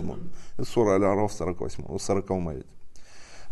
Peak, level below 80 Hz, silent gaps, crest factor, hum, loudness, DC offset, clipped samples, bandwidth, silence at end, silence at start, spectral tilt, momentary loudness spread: -10 dBFS; -46 dBFS; none; 18 dB; none; -27 LUFS; under 0.1%; under 0.1%; 12 kHz; 0 s; 0 s; -6 dB/octave; 17 LU